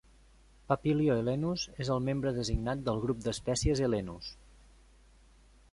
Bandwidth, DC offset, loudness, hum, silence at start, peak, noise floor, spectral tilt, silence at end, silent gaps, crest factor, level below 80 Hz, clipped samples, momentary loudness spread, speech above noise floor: 11.5 kHz; under 0.1%; -32 LUFS; none; 0.7 s; -12 dBFS; -60 dBFS; -6 dB/octave; 1.4 s; none; 22 dB; -48 dBFS; under 0.1%; 7 LU; 29 dB